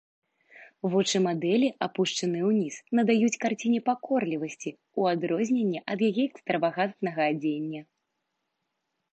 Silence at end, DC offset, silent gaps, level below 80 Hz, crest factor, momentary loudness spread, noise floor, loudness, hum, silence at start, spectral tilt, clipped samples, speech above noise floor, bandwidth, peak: 1.3 s; under 0.1%; none; -80 dBFS; 18 dB; 8 LU; -81 dBFS; -27 LUFS; none; 0.55 s; -5 dB/octave; under 0.1%; 54 dB; 8.8 kHz; -10 dBFS